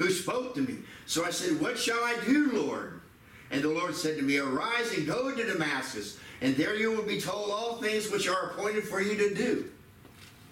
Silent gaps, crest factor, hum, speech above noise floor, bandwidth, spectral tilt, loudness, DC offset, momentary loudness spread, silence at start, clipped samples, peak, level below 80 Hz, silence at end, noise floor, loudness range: none; 16 dB; none; 23 dB; 16.5 kHz; -3.5 dB/octave; -30 LUFS; under 0.1%; 7 LU; 0 s; under 0.1%; -16 dBFS; -66 dBFS; 0 s; -53 dBFS; 1 LU